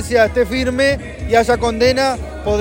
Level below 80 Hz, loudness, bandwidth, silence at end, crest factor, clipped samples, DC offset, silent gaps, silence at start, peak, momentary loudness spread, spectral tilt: -30 dBFS; -16 LUFS; 16.5 kHz; 0 s; 14 dB; under 0.1%; under 0.1%; none; 0 s; 0 dBFS; 6 LU; -5 dB/octave